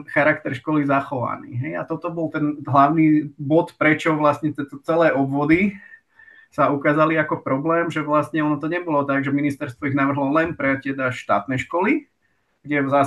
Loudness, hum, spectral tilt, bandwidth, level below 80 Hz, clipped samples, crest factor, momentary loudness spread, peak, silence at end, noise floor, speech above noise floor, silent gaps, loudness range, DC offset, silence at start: -21 LUFS; none; -7.5 dB/octave; 11.5 kHz; -58 dBFS; under 0.1%; 18 dB; 9 LU; -2 dBFS; 0 s; -68 dBFS; 48 dB; none; 3 LU; under 0.1%; 0 s